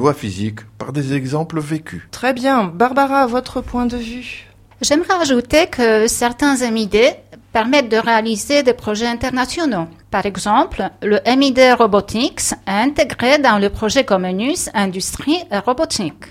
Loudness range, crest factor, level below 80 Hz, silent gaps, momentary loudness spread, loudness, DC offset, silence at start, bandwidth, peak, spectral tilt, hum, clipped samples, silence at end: 4 LU; 16 dB; -40 dBFS; none; 10 LU; -16 LUFS; under 0.1%; 0 s; 16 kHz; 0 dBFS; -4 dB/octave; none; under 0.1%; 0 s